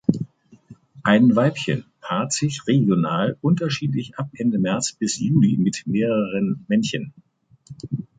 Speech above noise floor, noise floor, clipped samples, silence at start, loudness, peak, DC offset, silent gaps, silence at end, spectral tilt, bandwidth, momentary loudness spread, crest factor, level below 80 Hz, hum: 28 dB; -48 dBFS; under 0.1%; 0.1 s; -21 LUFS; -2 dBFS; under 0.1%; none; 0.15 s; -5.5 dB/octave; 9.4 kHz; 13 LU; 20 dB; -58 dBFS; none